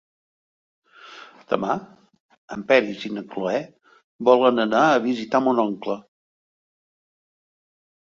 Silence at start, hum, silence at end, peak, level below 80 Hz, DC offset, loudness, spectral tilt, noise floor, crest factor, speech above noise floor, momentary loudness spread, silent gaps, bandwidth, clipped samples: 1.05 s; none; 2 s; -2 dBFS; -68 dBFS; under 0.1%; -21 LUFS; -5.5 dB/octave; -45 dBFS; 22 dB; 24 dB; 17 LU; 2.20-2.29 s, 2.38-2.48 s, 4.04-4.19 s; 7.4 kHz; under 0.1%